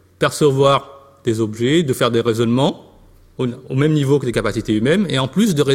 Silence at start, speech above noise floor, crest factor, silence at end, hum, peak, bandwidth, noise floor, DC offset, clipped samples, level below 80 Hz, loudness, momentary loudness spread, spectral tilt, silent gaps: 0.2 s; 31 dB; 16 dB; 0 s; none; -2 dBFS; 16.5 kHz; -47 dBFS; under 0.1%; under 0.1%; -46 dBFS; -17 LUFS; 8 LU; -6 dB/octave; none